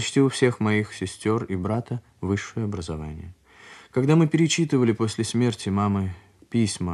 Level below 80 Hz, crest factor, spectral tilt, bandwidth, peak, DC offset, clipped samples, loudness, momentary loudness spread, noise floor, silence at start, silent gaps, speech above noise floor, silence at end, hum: -52 dBFS; 18 dB; -5.5 dB/octave; 12 kHz; -6 dBFS; under 0.1%; under 0.1%; -24 LUFS; 13 LU; -48 dBFS; 0 s; none; 25 dB; 0 s; none